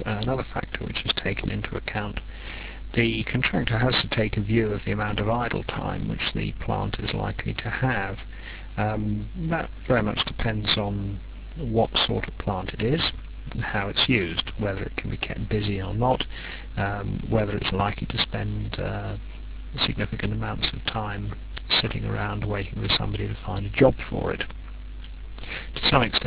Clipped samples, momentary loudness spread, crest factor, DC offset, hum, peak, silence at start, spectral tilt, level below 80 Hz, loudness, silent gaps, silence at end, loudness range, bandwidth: under 0.1%; 14 LU; 22 dB; 0.3%; none; -4 dBFS; 0 s; -9.5 dB/octave; -36 dBFS; -26 LUFS; none; 0 s; 3 LU; 4 kHz